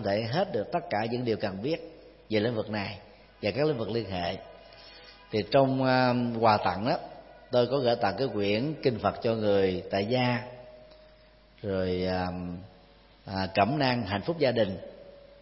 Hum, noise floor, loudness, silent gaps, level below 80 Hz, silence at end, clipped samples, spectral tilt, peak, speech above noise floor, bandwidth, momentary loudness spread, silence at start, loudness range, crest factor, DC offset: none; -57 dBFS; -28 LUFS; none; -60 dBFS; 0.2 s; under 0.1%; -10 dB/octave; -8 dBFS; 29 dB; 5.8 kHz; 18 LU; 0 s; 6 LU; 22 dB; under 0.1%